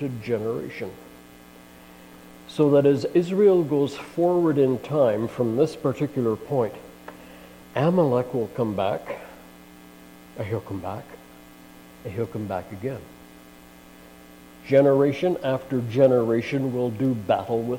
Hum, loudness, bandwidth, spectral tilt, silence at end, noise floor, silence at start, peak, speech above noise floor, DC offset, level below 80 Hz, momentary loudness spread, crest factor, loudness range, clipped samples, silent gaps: none; -23 LUFS; 16.5 kHz; -8 dB/octave; 0 s; -48 dBFS; 0 s; -6 dBFS; 25 dB; under 0.1%; -60 dBFS; 20 LU; 18 dB; 13 LU; under 0.1%; none